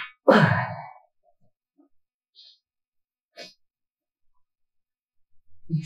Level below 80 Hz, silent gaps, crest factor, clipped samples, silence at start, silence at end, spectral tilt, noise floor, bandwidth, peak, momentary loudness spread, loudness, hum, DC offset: -66 dBFS; 2.14-2.21 s, 2.88-2.92 s, 3.23-3.29 s; 26 dB; under 0.1%; 0 s; 0 s; -7.5 dB/octave; -88 dBFS; 12.5 kHz; -2 dBFS; 27 LU; -21 LUFS; none; under 0.1%